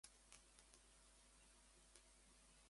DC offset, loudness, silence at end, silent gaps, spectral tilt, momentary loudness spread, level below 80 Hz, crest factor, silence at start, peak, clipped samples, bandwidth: under 0.1%; -68 LUFS; 0 s; none; -1.5 dB/octave; 3 LU; -76 dBFS; 30 dB; 0.05 s; -38 dBFS; under 0.1%; 11.5 kHz